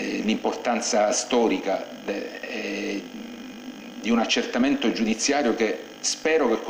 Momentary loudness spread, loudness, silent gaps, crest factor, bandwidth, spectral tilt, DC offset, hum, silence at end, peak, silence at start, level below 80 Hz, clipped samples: 15 LU; -24 LUFS; none; 16 dB; 16 kHz; -3 dB/octave; under 0.1%; none; 0 s; -10 dBFS; 0 s; -58 dBFS; under 0.1%